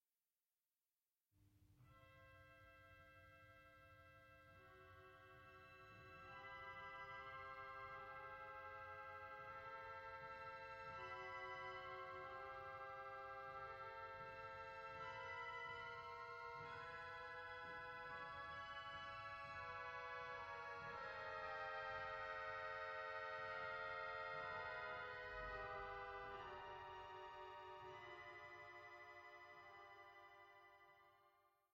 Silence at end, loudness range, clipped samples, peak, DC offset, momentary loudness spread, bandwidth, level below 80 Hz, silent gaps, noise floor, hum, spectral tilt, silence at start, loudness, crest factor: 0.25 s; 15 LU; under 0.1%; -38 dBFS; under 0.1%; 17 LU; 15.5 kHz; -76 dBFS; none; under -90 dBFS; none; -4.5 dB/octave; 1.35 s; -53 LUFS; 16 dB